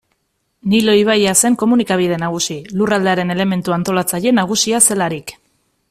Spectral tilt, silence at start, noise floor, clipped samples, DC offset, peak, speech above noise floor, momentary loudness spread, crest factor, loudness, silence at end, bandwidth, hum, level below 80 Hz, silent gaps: -3.5 dB/octave; 0.65 s; -67 dBFS; under 0.1%; under 0.1%; 0 dBFS; 53 dB; 9 LU; 16 dB; -14 LUFS; 0.6 s; 16 kHz; none; -54 dBFS; none